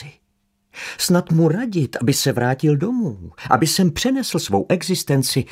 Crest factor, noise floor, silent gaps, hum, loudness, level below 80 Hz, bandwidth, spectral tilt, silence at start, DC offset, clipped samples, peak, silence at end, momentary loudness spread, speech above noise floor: 20 dB; -67 dBFS; none; none; -19 LUFS; -50 dBFS; 16 kHz; -5 dB/octave; 0 s; under 0.1%; under 0.1%; 0 dBFS; 0 s; 7 LU; 49 dB